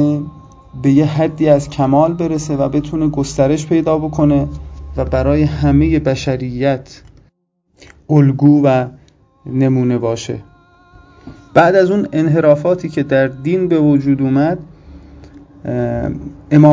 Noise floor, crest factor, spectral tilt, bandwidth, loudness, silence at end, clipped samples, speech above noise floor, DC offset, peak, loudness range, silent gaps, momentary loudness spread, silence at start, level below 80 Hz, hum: -61 dBFS; 14 dB; -8 dB/octave; 7.8 kHz; -14 LUFS; 0 s; 0.1%; 48 dB; under 0.1%; 0 dBFS; 3 LU; none; 12 LU; 0 s; -34 dBFS; none